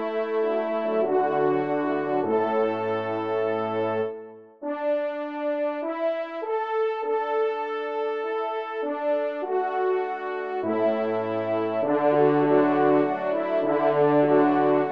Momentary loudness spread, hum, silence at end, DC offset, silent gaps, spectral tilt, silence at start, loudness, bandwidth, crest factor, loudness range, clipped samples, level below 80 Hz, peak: 9 LU; none; 0 s; 0.1%; none; -8.5 dB/octave; 0 s; -25 LUFS; 5.6 kHz; 16 dB; 6 LU; under 0.1%; -78 dBFS; -8 dBFS